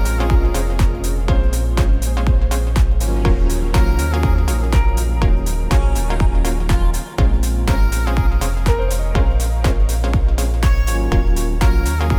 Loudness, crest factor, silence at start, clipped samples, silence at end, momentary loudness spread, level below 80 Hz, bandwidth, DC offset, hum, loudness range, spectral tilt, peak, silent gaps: -18 LUFS; 12 dB; 0 s; under 0.1%; 0 s; 2 LU; -16 dBFS; 16 kHz; under 0.1%; none; 1 LU; -6 dB/octave; -2 dBFS; none